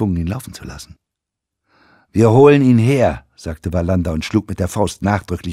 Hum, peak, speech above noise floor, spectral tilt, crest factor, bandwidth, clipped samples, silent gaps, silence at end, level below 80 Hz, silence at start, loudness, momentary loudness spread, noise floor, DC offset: none; 0 dBFS; 66 dB; -7 dB/octave; 16 dB; 14.5 kHz; under 0.1%; none; 0 s; -36 dBFS; 0 s; -15 LUFS; 21 LU; -82 dBFS; under 0.1%